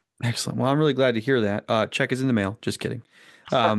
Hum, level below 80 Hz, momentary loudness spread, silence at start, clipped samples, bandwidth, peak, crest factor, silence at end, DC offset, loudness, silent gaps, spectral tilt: none; -68 dBFS; 8 LU; 0.2 s; under 0.1%; 12.5 kHz; -6 dBFS; 16 dB; 0 s; under 0.1%; -24 LUFS; none; -5.5 dB/octave